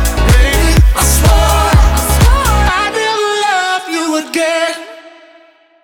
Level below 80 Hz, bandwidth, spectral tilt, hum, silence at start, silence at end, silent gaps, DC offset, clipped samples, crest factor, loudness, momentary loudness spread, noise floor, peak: -14 dBFS; over 20 kHz; -4 dB/octave; none; 0 s; 0.75 s; none; under 0.1%; under 0.1%; 10 dB; -11 LUFS; 6 LU; -45 dBFS; 0 dBFS